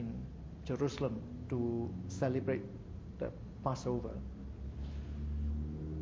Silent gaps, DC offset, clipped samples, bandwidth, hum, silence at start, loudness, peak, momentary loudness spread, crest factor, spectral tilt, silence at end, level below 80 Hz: none; under 0.1%; under 0.1%; 7.8 kHz; none; 0 s; -40 LUFS; -20 dBFS; 11 LU; 18 dB; -7.5 dB/octave; 0 s; -46 dBFS